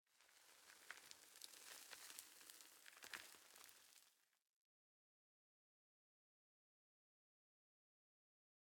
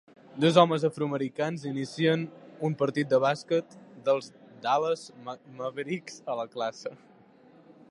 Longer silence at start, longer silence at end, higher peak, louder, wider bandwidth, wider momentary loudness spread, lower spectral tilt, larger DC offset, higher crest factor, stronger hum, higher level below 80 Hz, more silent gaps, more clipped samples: second, 0.05 s vs 0.35 s; first, 4.25 s vs 0.95 s; second, -30 dBFS vs -4 dBFS; second, -60 LUFS vs -28 LUFS; first, 18 kHz vs 11.5 kHz; second, 10 LU vs 18 LU; second, 1.5 dB/octave vs -6 dB/octave; neither; first, 36 dB vs 26 dB; neither; second, under -90 dBFS vs -78 dBFS; neither; neither